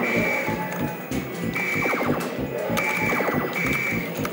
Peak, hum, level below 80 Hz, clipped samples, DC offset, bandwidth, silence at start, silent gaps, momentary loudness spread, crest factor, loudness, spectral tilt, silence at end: -8 dBFS; none; -48 dBFS; under 0.1%; under 0.1%; 17 kHz; 0 s; none; 6 LU; 16 dB; -24 LUFS; -5 dB/octave; 0 s